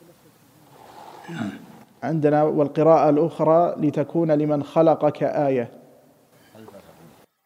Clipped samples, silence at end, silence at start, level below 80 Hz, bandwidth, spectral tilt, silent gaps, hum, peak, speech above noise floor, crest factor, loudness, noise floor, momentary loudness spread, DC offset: under 0.1%; 0.65 s; 0.95 s; -72 dBFS; 15 kHz; -9 dB/octave; none; none; -4 dBFS; 35 dB; 18 dB; -20 LUFS; -55 dBFS; 16 LU; under 0.1%